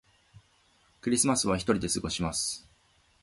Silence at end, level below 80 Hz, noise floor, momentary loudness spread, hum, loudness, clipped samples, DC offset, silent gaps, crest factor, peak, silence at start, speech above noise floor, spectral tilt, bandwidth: 0.65 s; -52 dBFS; -66 dBFS; 9 LU; none; -28 LUFS; under 0.1%; under 0.1%; none; 22 dB; -10 dBFS; 1.05 s; 37 dB; -3.5 dB/octave; 12 kHz